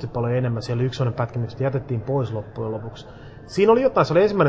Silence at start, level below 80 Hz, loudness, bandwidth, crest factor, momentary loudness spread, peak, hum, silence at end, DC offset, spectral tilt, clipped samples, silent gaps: 0 s; -48 dBFS; -22 LUFS; 8 kHz; 18 dB; 15 LU; -4 dBFS; none; 0 s; under 0.1%; -8 dB/octave; under 0.1%; none